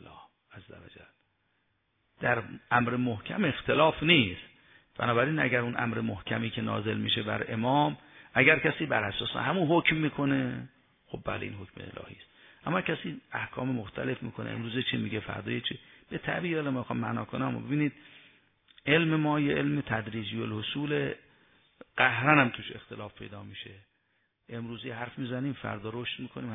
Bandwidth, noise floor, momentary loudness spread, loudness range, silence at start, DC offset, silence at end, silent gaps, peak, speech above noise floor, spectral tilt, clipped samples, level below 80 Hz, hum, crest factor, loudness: 3.9 kHz; -75 dBFS; 19 LU; 8 LU; 0.05 s; under 0.1%; 0 s; none; -6 dBFS; 45 dB; -9 dB/octave; under 0.1%; -60 dBFS; none; 24 dB; -29 LUFS